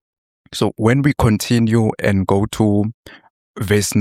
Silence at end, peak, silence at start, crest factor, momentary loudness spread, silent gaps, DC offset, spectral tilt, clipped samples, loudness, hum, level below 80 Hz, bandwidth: 0 s; -2 dBFS; 0.5 s; 16 dB; 7 LU; 2.94-3.04 s, 3.30-3.54 s; under 0.1%; -6 dB/octave; under 0.1%; -17 LUFS; none; -40 dBFS; 16 kHz